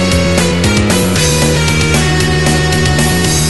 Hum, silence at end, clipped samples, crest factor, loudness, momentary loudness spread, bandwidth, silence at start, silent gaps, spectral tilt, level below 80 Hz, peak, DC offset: none; 0 s; under 0.1%; 10 dB; -11 LUFS; 1 LU; 12.5 kHz; 0 s; none; -4 dB/octave; -22 dBFS; 0 dBFS; 4%